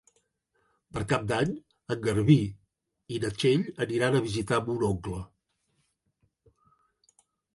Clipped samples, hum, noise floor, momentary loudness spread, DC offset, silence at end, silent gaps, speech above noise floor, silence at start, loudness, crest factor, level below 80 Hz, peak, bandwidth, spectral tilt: under 0.1%; none; -75 dBFS; 15 LU; under 0.1%; 2.3 s; none; 48 dB; 0.95 s; -28 LUFS; 22 dB; -54 dBFS; -8 dBFS; 11.5 kHz; -6.5 dB/octave